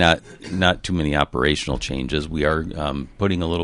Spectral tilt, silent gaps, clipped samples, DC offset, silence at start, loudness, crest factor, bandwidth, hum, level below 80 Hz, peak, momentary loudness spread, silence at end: -5 dB/octave; none; under 0.1%; under 0.1%; 0 s; -22 LUFS; 20 dB; 11.5 kHz; none; -34 dBFS; -2 dBFS; 7 LU; 0 s